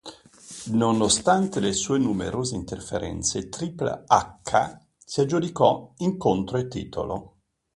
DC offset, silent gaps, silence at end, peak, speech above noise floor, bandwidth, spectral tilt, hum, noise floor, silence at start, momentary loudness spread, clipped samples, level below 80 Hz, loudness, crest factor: under 0.1%; none; 0.5 s; -2 dBFS; 21 dB; 11.5 kHz; -4.5 dB/octave; none; -45 dBFS; 0.05 s; 12 LU; under 0.1%; -50 dBFS; -25 LUFS; 22 dB